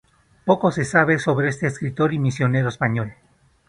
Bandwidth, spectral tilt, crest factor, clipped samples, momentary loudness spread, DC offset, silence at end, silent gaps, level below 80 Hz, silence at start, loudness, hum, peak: 11 kHz; -7 dB/octave; 20 dB; under 0.1%; 7 LU; under 0.1%; 0.55 s; none; -54 dBFS; 0.45 s; -21 LUFS; none; 0 dBFS